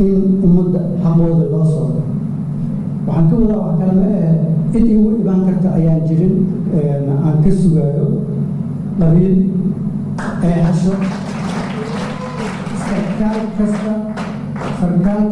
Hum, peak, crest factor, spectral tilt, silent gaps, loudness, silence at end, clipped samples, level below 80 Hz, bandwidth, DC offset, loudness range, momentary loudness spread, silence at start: none; 0 dBFS; 14 dB; -9 dB/octave; none; -15 LUFS; 0 s; under 0.1%; -32 dBFS; 10.5 kHz; under 0.1%; 5 LU; 9 LU; 0 s